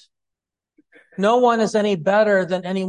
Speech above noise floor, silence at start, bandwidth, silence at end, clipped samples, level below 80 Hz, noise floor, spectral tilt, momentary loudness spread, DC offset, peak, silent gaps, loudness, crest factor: 67 dB; 1.2 s; 11 kHz; 0 s; under 0.1%; -68 dBFS; -85 dBFS; -5.5 dB/octave; 6 LU; under 0.1%; -4 dBFS; none; -18 LUFS; 16 dB